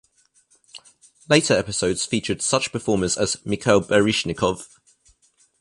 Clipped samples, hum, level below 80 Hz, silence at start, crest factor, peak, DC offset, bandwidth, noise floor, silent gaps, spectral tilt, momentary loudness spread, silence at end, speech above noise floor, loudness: under 0.1%; none; -50 dBFS; 0.75 s; 22 dB; -2 dBFS; under 0.1%; 11.5 kHz; -61 dBFS; none; -3.5 dB/octave; 6 LU; 0.95 s; 40 dB; -21 LUFS